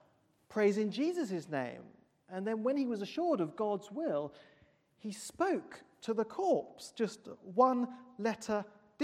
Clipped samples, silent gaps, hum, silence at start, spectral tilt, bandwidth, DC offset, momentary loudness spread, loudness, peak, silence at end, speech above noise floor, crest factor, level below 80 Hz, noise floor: under 0.1%; none; none; 0.5 s; -5.5 dB/octave; 15.5 kHz; under 0.1%; 15 LU; -35 LUFS; -16 dBFS; 0 s; 35 dB; 20 dB; -80 dBFS; -70 dBFS